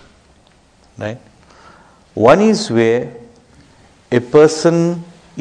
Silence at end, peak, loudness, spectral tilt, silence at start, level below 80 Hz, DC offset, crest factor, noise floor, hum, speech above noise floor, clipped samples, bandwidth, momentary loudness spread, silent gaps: 0 s; 0 dBFS; -13 LUFS; -6 dB/octave; 1 s; -52 dBFS; under 0.1%; 16 dB; -50 dBFS; none; 38 dB; 0.2%; 10 kHz; 20 LU; none